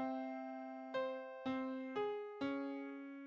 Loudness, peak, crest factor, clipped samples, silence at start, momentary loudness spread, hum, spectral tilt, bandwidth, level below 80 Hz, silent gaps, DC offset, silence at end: -44 LUFS; -30 dBFS; 14 dB; under 0.1%; 0 s; 6 LU; none; -6.5 dB/octave; 7.4 kHz; -84 dBFS; none; under 0.1%; 0 s